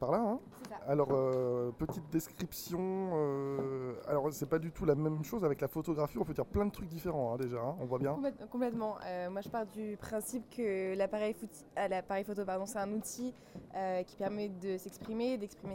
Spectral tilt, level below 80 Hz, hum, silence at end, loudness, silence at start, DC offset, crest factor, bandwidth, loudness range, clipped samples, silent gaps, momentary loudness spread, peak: -6.5 dB/octave; -60 dBFS; none; 0 s; -37 LUFS; 0 s; under 0.1%; 20 dB; 16 kHz; 3 LU; under 0.1%; none; 8 LU; -18 dBFS